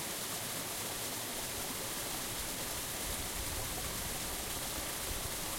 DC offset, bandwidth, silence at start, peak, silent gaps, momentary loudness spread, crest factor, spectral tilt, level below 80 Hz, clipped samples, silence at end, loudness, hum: under 0.1%; 16.5 kHz; 0 s; -24 dBFS; none; 0 LU; 14 dB; -1.5 dB/octave; -50 dBFS; under 0.1%; 0 s; -37 LUFS; none